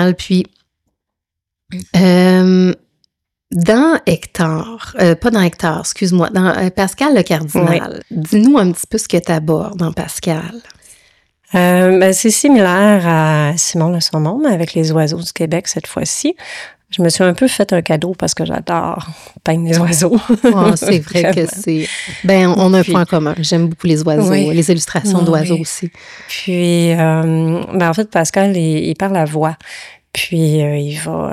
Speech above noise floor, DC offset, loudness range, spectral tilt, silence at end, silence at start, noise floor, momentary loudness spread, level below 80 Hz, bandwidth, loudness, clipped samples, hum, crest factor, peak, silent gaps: 67 dB; under 0.1%; 4 LU; -5.5 dB/octave; 0 s; 0 s; -80 dBFS; 11 LU; -48 dBFS; 15 kHz; -13 LUFS; under 0.1%; none; 12 dB; -2 dBFS; none